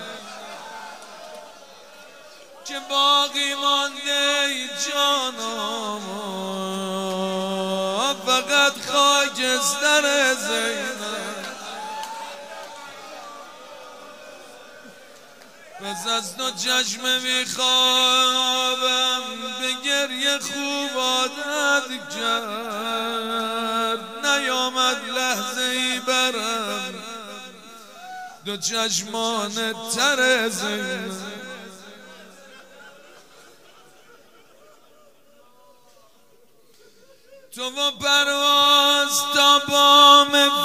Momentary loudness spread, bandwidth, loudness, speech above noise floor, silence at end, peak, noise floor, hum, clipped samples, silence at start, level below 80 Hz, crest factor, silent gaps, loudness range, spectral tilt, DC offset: 22 LU; 16 kHz; -20 LUFS; 37 dB; 0 s; 0 dBFS; -58 dBFS; none; under 0.1%; 0 s; -74 dBFS; 24 dB; none; 13 LU; -1 dB/octave; 0.2%